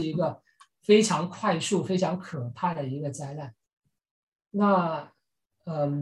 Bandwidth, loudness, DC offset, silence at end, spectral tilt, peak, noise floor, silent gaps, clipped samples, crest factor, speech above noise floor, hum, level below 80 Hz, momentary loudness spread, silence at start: 12 kHz; -27 LUFS; under 0.1%; 0 s; -5.5 dB/octave; -6 dBFS; -77 dBFS; 3.73-3.77 s, 4.11-4.32 s; under 0.1%; 22 dB; 51 dB; none; -68 dBFS; 16 LU; 0 s